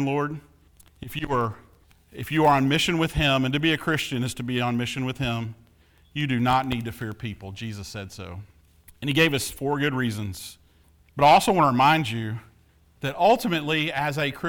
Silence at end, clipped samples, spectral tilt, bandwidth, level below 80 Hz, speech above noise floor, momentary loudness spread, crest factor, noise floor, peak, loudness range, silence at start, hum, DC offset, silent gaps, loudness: 0 s; under 0.1%; -5 dB/octave; over 20 kHz; -48 dBFS; 35 dB; 17 LU; 18 dB; -58 dBFS; -6 dBFS; 7 LU; 0 s; none; under 0.1%; none; -23 LUFS